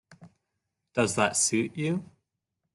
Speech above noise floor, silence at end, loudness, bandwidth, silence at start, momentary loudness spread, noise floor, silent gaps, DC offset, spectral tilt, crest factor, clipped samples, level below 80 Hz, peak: 57 dB; 0.7 s; -27 LUFS; 12.5 kHz; 0.2 s; 10 LU; -83 dBFS; none; under 0.1%; -3.5 dB/octave; 22 dB; under 0.1%; -66 dBFS; -10 dBFS